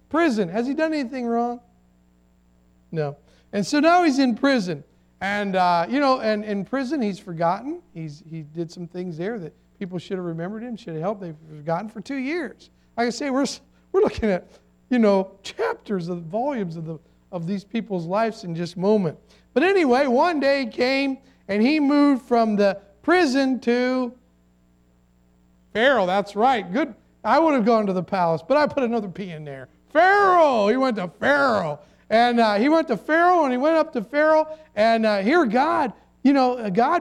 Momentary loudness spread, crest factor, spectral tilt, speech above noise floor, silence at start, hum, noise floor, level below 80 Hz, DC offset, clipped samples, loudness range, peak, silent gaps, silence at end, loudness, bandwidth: 15 LU; 16 dB; -6 dB/octave; 38 dB; 0.1 s; none; -59 dBFS; -58 dBFS; under 0.1%; under 0.1%; 9 LU; -6 dBFS; none; 0 s; -21 LUFS; 11.5 kHz